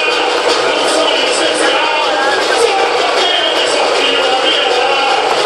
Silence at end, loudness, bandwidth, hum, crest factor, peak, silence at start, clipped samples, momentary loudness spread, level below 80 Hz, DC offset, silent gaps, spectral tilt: 0 s; -11 LUFS; 13 kHz; none; 12 dB; 0 dBFS; 0 s; under 0.1%; 1 LU; -54 dBFS; under 0.1%; none; -0.5 dB/octave